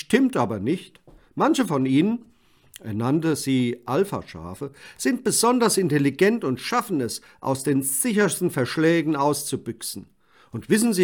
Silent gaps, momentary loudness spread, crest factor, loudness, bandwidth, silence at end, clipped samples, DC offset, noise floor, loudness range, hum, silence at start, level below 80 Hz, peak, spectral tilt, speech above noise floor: none; 13 LU; 20 dB; -23 LUFS; 18 kHz; 0 s; under 0.1%; under 0.1%; -50 dBFS; 3 LU; none; 0.1 s; -64 dBFS; -4 dBFS; -4.5 dB/octave; 28 dB